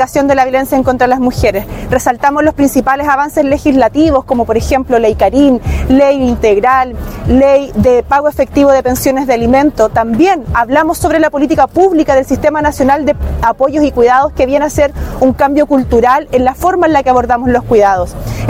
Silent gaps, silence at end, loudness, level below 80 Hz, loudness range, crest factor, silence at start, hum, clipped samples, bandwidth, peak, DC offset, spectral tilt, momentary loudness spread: none; 0 s; -10 LUFS; -26 dBFS; 1 LU; 10 dB; 0 s; none; 0.7%; 16.5 kHz; 0 dBFS; under 0.1%; -6 dB/octave; 4 LU